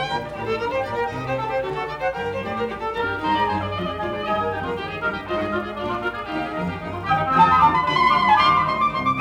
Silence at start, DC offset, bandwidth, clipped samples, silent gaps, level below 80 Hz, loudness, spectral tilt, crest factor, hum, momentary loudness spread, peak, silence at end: 0 s; under 0.1%; 16.5 kHz; under 0.1%; none; -46 dBFS; -22 LUFS; -6 dB/octave; 18 dB; none; 11 LU; -4 dBFS; 0 s